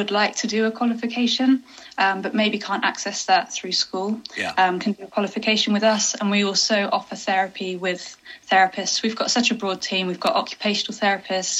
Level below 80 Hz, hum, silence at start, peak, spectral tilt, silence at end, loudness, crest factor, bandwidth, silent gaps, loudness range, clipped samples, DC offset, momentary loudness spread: -70 dBFS; none; 0 s; -4 dBFS; -2.5 dB/octave; 0 s; -21 LUFS; 18 dB; 10 kHz; none; 1 LU; under 0.1%; under 0.1%; 8 LU